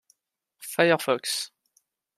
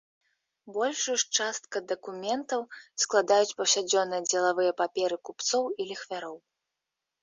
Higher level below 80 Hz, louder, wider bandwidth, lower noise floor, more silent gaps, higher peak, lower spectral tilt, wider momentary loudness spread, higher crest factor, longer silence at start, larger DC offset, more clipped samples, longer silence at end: about the same, -78 dBFS vs -80 dBFS; first, -25 LUFS vs -28 LUFS; first, 15.5 kHz vs 8.4 kHz; second, -77 dBFS vs -87 dBFS; neither; first, -4 dBFS vs -8 dBFS; first, -3 dB/octave vs -1 dB/octave; first, 16 LU vs 12 LU; about the same, 24 dB vs 20 dB; about the same, 0.6 s vs 0.65 s; neither; neither; second, 0.7 s vs 0.85 s